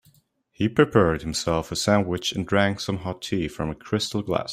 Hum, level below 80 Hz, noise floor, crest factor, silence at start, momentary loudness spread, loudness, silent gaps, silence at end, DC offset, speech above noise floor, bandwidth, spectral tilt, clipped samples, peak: none; -48 dBFS; -61 dBFS; 22 dB; 0.6 s; 9 LU; -24 LUFS; none; 0 s; under 0.1%; 38 dB; 16 kHz; -5 dB/octave; under 0.1%; -2 dBFS